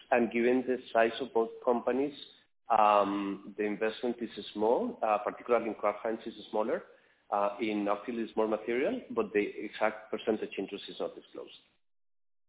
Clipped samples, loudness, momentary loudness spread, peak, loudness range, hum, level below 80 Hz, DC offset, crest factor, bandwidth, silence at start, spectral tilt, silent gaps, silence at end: under 0.1%; -32 LUFS; 11 LU; -12 dBFS; 4 LU; none; -72 dBFS; under 0.1%; 20 dB; 4 kHz; 0.1 s; -3.5 dB/octave; none; 0.9 s